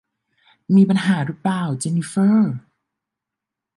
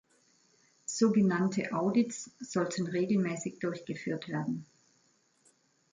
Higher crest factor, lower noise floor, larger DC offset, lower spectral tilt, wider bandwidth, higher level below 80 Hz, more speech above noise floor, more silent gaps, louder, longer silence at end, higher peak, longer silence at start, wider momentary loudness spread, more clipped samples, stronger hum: about the same, 16 dB vs 18 dB; first, -85 dBFS vs -70 dBFS; neither; about the same, -6.5 dB/octave vs -5.5 dB/octave; first, 11.5 kHz vs 9.6 kHz; first, -68 dBFS vs -76 dBFS; first, 67 dB vs 40 dB; neither; first, -18 LUFS vs -32 LUFS; about the same, 1.2 s vs 1.3 s; first, -4 dBFS vs -14 dBFS; second, 0.7 s vs 0.9 s; second, 8 LU vs 11 LU; neither; neither